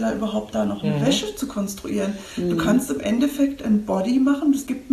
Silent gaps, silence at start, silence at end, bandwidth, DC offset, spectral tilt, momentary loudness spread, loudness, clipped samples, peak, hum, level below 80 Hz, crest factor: none; 0 s; 0 s; 13 kHz; under 0.1%; -5.5 dB/octave; 8 LU; -22 LUFS; under 0.1%; -6 dBFS; none; -48 dBFS; 14 dB